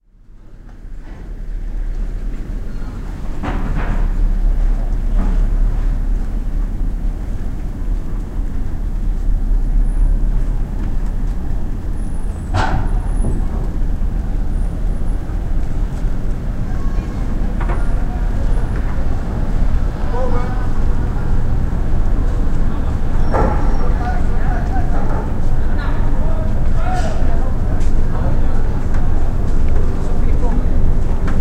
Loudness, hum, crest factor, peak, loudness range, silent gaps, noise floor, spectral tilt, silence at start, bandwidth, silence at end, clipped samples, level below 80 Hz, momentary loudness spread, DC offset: -22 LUFS; none; 14 dB; 0 dBFS; 4 LU; none; -39 dBFS; -8 dB/octave; 0.3 s; 5.4 kHz; 0 s; under 0.1%; -16 dBFS; 7 LU; 0.6%